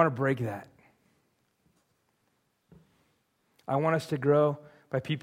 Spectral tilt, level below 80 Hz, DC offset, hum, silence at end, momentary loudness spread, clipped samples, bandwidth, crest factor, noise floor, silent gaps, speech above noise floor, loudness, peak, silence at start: -7.5 dB/octave; -72 dBFS; under 0.1%; none; 0.05 s; 17 LU; under 0.1%; 15.5 kHz; 24 dB; -74 dBFS; none; 47 dB; -29 LUFS; -8 dBFS; 0 s